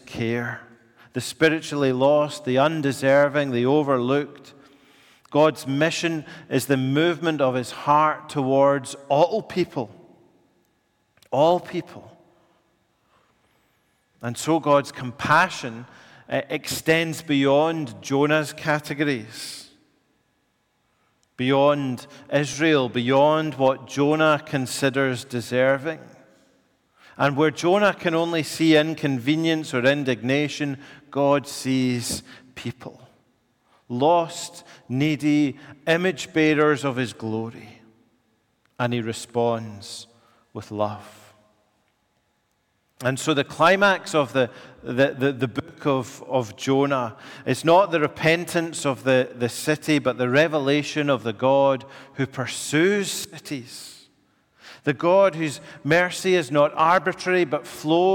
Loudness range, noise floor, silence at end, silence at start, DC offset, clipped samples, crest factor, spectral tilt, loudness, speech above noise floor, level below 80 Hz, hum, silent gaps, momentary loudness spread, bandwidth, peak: 7 LU; -69 dBFS; 0 s; 0.05 s; under 0.1%; under 0.1%; 18 dB; -5 dB/octave; -22 LUFS; 47 dB; -66 dBFS; none; none; 14 LU; 17.5 kHz; -6 dBFS